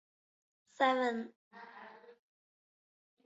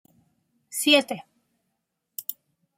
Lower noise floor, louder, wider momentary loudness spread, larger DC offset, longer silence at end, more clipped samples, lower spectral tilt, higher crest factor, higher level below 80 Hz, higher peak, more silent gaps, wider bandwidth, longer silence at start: second, -55 dBFS vs -79 dBFS; second, -33 LUFS vs -23 LUFS; first, 24 LU vs 18 LU; neither; first, 1.15 s vs 0.45 s; neither; about the same, -1 dB/octave vs -1.5 dB/octave; about the same, 22 dB vs 24 dB; second, -88 dBFS vs -80 dBFS; second, -16 dBFS vs -4 dBFS; first, 1.36-1.51 s vs none; second, 7.6 kHz vs 16.5 kHz; about the same, 0.8 s vs 0.7 s